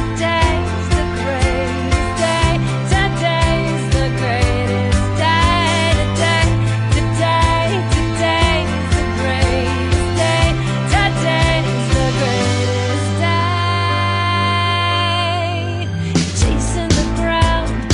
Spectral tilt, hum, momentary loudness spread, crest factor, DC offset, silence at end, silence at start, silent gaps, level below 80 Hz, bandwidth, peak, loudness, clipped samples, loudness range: -5 dB/octave; none; 4 LU; 12 dB; under 0.1%; 0 s; 0 s; none; -24 dBFS; 11 kHz; -4 dBFS; -16 LUFS; under 0.1%; 2 LU